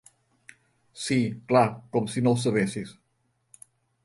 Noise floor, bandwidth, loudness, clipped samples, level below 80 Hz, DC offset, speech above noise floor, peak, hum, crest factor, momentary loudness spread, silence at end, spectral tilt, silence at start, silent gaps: -72 dBFS; 11.5 kHz; -26 LUFS; under 0.1%; -64 dBFS; under 0.1%; 47 dB; -8 dBFS; none; 20 dB; 13 LU; 1.15 s; -6 dB/octave; 0.95 s; none